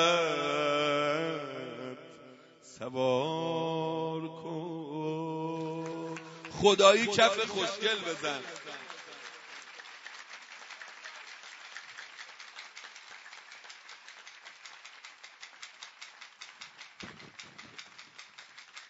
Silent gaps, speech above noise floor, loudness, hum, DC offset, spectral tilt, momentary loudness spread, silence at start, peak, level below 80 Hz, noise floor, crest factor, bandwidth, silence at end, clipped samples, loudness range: none; 28 dB; -30 LUFS; none; under 0.1%; -2 dB/octave; 22 LU; 0 s; -6 dBFS; -74 dBFS; -55 dBFS; 26 dB; 7.6 kHz; 0 s; under 0.1%; 20 LU